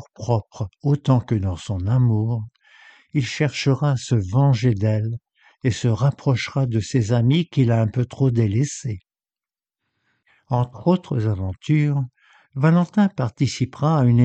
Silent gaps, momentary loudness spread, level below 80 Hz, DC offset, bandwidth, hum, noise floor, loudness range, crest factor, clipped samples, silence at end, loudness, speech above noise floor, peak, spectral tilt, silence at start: none; 8 LU; -50 dBFS; under 0.1%; 8.6 kHz; none; under -90 dBFS; 4 LU; 16 dB; under 0.1%; 0 s; -21 LUFS; over 71 dB; -4 dBFS; -7 dB/octave; 0 s